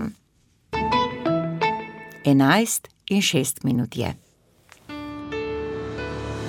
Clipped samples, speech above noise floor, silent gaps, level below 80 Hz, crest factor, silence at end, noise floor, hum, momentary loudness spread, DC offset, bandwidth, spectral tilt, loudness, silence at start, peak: under 0.1%; 42 dB; none; -48 dBFS; 20 dB; 0 s; -62 dBFS; none; 16 LU; under 0.1%; 17.5 kHz; -4.5 dB/octave; -23 LUFS; 0 s; -4 dBFS